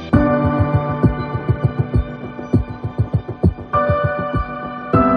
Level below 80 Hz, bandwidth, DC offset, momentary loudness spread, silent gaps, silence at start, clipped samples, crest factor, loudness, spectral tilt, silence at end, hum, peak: -30 dBFS; 5.2 kHz; under 0.1%; 8 LU; none; 0 s; under 0.1%; 16 dB; -19 LUFS; -10 dB/octave; 0 s; none; -2 dBFS